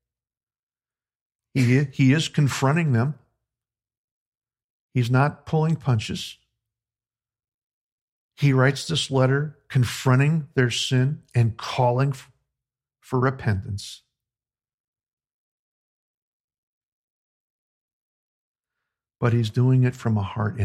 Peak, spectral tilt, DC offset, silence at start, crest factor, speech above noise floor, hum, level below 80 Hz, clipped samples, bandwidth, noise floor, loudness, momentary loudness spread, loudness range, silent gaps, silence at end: -4 dBFS; -6 dB/octave; under 0.1%; 1.55 s; 20 dB; over 69 dB; none; -58 dBFS; under 0.1%; 13 kHz; under -90 dBFS; -22 LUFS; 9 LU; 9 LU; 3.97-4.32 s, 4.64-4.89 s, 7.54-8.29 s, 14.74-14.93 s, 15.13-15.17 s, 15.34-16.48 s, 16.58-18.55 s; 0 s